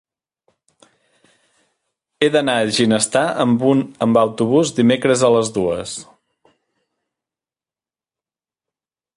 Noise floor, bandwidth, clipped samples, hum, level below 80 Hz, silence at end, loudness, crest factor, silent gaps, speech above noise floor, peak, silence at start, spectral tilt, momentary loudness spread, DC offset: under -90 dBFS; 11.5 kHz; under 0.1%; none; -58 dBFS; 3.15 s; -16 LUFS; 18 dB; none; over 74 dB; -2 dBFS; 2.2 s; -4.5 dB/octave; 6 LU; under 0.1%